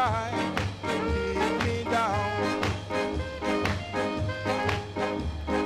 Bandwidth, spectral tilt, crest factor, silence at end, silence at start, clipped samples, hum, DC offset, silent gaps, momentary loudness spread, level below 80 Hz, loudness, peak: 14.5 kHz; -5.5 dB/octave; 16 dB; 0 s; 0 s; under 0.1%; none; under 0.1%; none; 4 LU; -42 dBFS; -29 LUFS; -12 dBFS